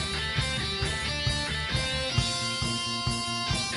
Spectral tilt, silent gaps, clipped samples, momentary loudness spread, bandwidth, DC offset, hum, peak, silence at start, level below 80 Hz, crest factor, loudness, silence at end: -3 dB/octave; none; under 0.1%; 2 LU; 11.5 kHz; under 0.1%; none; -12 dBFS; 0 s; -40 dBFS; 18 dB; -28 LUFS; 0 s